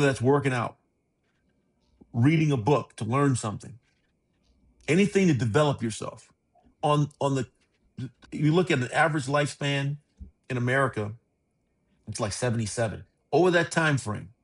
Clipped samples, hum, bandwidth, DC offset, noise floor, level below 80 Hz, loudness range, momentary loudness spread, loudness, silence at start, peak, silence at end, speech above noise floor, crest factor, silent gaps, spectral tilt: under 0.1%; none; 11.5 kHz; under 0.1%; -73 dBFS; -60 dBFS; 3 LU; 15 LU; -26 LUFS; 0 s; -8 dBFS; 0.15 s; 48 dB; 20 dB; none; -6 dB/octave